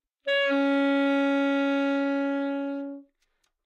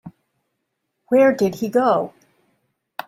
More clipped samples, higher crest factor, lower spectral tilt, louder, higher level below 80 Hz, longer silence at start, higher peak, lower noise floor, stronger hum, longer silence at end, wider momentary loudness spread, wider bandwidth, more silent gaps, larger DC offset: neither; second, 10 dB vs 16 dB; second, -4 dB/octave vs -6.5 dB/octave; second, -25 LUFS vs -18 LUFS; second, -86 dBFS vs -66 dBFS; first, 0.25 s vs 0.05 s; second, -16 dBFS vs -4 dBFS; about the same, -74 dBFS vs -76 dBFS; neither; second, 0.65 s vs 1 s; second, 10 LU vs 14 LU; second, 7.2 kHz vs 16 kHz; neither; neither